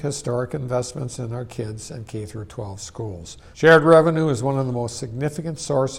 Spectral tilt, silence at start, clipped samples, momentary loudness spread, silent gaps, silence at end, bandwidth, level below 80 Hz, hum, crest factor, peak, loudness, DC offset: -5.5 dB/octave; 0 s; under 0.1%; 19 LU; none; 0 s; 13.5 kHz; -50 dBFS; none; 18 dB; -2 dBFS; -20 LUFS; under 0.1%